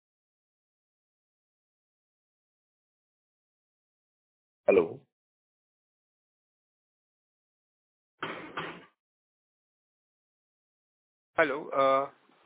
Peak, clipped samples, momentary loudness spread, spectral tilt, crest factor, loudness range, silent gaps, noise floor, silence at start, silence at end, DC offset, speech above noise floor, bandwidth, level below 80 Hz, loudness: -10 dBFS; under 0.1%; 15 LU; -3 dB/octave; 26 dB; 12 LU; 5.12-8.18 s, 9.00-11.33 s; under -90 dBFS; 4.7 s; 0.35 s; under 0.1%; over 63 dB; 4 kHz; -74 dBFS; -29 LUFS